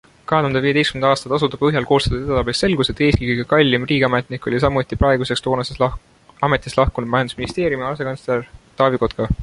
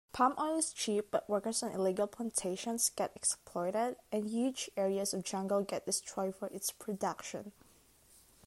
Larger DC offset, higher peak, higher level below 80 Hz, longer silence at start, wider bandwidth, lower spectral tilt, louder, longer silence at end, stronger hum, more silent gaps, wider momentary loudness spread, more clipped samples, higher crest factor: neither; first, -2 dBFS vs -18 dBFS; first, -34 dBFS vs -72 dBFS; first, 0.3 s vs 0.15 s; second, 11.5 kHz vs 16 kHz; first, -6 dB/octave vs -3.5 dB/octave; first, -18 LUFS vs -35 LUFS; second, 0 s vs 0.95 s; neither; neither; about the same, 7 LU vs 6 LU; neither; about the same, 16 dB vs 18 dB